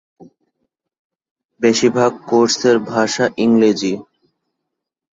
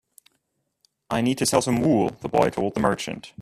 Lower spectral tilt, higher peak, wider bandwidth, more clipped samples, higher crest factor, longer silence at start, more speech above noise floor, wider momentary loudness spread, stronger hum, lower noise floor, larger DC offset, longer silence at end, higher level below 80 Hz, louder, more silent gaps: about the same, -4 dB/octave vs -5 dB/octave; about the same, -2 dBFS vs -4 dBFS; second, 7.8 kHz vs 15 kHz; neither; about the same, 16 dB vs 20 dB; second, 0.2 s vs 1.1 s; first, 64 dB vs 52 dB; about the same, 6 LU vs 7 LU; neither; first, -79 dBFS vs -74 dBFS; neither; first, 1.1 s vs 0 s; second, -60 dBFS vs -54 dBFS; first, -15 LUFS vs -23 LUFS; first, 0.99-1.10 s, 1.31-1.36 s, 1.45-1.49 s vs none